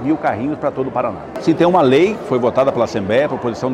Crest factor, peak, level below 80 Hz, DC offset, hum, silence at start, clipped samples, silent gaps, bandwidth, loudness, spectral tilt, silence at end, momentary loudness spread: 14 dB; -2 dBFS; -50 dBFS; under 0.1%; none; 0 s; under 0.1%; none; 11 kHz; -16 LUFS; -7 dB/octave; 0 s; 8 LU